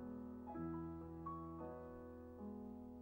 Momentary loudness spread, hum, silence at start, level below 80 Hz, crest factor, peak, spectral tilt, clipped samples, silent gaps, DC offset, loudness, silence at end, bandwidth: 6 LU; none; 0 s; -66 dBFS; 14 dB; -38 dBFS; -10.5 dB/octave; under 0.1%; none; under 0.1%; -51 LUFS; 0 s; 16 kHz